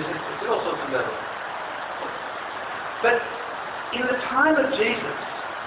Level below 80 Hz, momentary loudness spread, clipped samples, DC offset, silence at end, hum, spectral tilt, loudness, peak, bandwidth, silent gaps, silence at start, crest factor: -60 dBFS; 11 LU; under 0.1%; under 0.1%; 0 s; none; -8 dB/octave; -25 LUFS; -6 dBFS; 4 kHz; none; 0 s; 18 dB